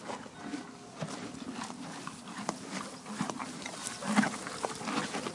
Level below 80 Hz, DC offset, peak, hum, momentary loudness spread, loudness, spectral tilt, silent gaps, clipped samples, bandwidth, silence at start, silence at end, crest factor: -72 dBFS; under 0.1%; -12 dBFS; none; 12 LU; -37 LUFS; -3.5 dB/octave; none; under 0.1%; 11.5 kHz; 0 s; 0 s; 24 dB